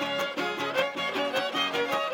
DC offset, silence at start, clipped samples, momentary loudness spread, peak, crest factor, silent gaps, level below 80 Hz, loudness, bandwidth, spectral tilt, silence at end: under 0.1%; 0 s; under 0.1%; 2 LU; -14 dBFS; 16 dB; none; -78 dBFS; -28 LUFS; 17 kHz; -3 dB/octave; 0 s